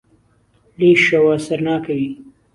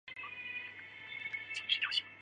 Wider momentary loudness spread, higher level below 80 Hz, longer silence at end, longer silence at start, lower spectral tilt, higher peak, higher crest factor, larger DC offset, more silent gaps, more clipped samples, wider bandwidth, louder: about the same, 13 LU vs 14 LU; first, -58 dBFS vs -82 dBFS; first, 0.25 s vs 0 s; first, 0.8 s vs 0.05 s; first, -6 dB/octave vs 0 dB/octave; first, -2 dBFS vs -18 dBFS; second, 16 dB vs 22 dB; neither; neither; neither; first, 11.5 kHz vs 10 kHz; first, -16 LUFS vs -37 LUFS